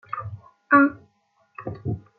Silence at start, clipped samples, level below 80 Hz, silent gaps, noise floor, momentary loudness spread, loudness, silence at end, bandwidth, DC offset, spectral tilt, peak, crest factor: 0.1 s; under 0.1%; -60 dBFS; none; -65 dBFS; 20 LU; -22 LUFS; 0.2 s; 4.4 kHz; under 0.1%; -11 dB/octave; -4 dBFS; 20 dB